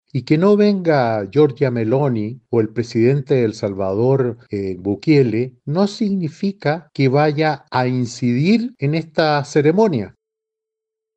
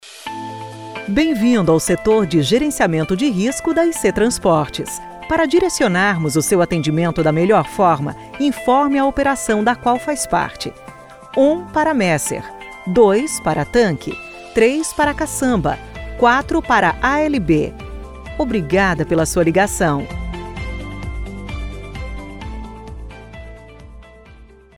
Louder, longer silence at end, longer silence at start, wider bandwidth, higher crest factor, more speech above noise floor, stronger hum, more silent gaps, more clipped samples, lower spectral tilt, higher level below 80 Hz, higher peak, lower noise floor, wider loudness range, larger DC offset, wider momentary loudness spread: about the same, -18 LUFS vs -17 LUFS; first, 1.1 s vs 0.3 s; about the same, 0.15 s vs 0.05 s; second, 8.4 kHz vs 17.5 kHz; about the same, 14 dB vs 16 dB; first, 66 dB vs 27 dB; neither; neither; neither; first, -7.5 dB/octave vs -5 dB/octave; second, -60 dBFS vs -36 dBFS; about the same, -2 dBFS vs -2 dBFS; first, -83 dBFS vs -43 dBFS; second, 2 LU vs 7 LU; second, under 0.1% vs 0.3%; second, 8 LU vs 16 LU